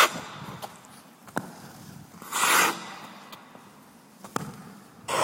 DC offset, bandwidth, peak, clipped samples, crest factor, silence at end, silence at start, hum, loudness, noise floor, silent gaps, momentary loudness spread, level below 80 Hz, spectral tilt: under 0.1%; 16.5 kHz; -6 dBFS; under 0.1%; 26 dB; 0 s; 0 s; none; -27 LUFS; -52 dBFS; none; 26 LU; -70 dBFS; -1.5 dB/octave